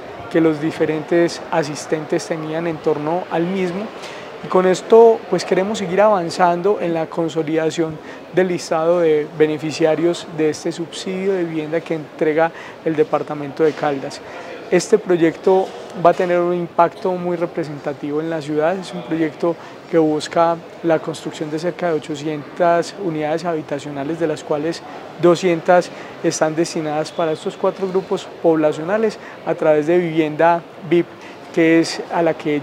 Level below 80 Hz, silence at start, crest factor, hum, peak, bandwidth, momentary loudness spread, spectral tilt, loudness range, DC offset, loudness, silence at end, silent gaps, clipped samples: -66 dBFS; 0 s; 18 dB; none; 0 dBFS; 12 kHz; 10 LU; -5.5 dB/octave; 5 LU; under 0.1%; -19 LUFS; 0 s; none; under 0.1%